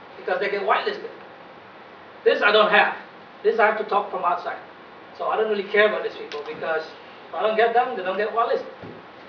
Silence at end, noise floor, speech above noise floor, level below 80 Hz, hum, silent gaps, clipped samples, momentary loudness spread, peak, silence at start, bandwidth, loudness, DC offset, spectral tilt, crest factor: 0 s; -44 dBFS; 22 dB; -76 dBFS; none; none; under 0.1%; 21 LU; -2 dBFS; 0 s; 5.4 kHz; -22 LUFS; under 0.1%; -5 dB/octave; 20 dB